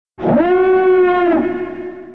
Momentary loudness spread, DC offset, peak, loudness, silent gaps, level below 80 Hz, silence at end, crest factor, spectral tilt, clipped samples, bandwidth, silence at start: 13 LU; 0.5%; -2 dBFS; -14 LUFS; none; -48 dBFS; 0 s; 12 dB; -9 dB/octave; under 0.1%; 4.3 kHz; 0.2 s